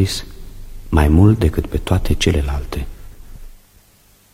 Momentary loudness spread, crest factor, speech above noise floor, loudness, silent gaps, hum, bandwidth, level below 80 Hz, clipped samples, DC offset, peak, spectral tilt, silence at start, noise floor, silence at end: 16 LU; 18 dB; 37 dB; -17 LUFS; none; none; 15.5 kHz; -24 dBFS; under 0.1%; under 0.1%; 0 dBFS; -6.5 dB/octave; 0 s; -52 dBFS; 0.75 s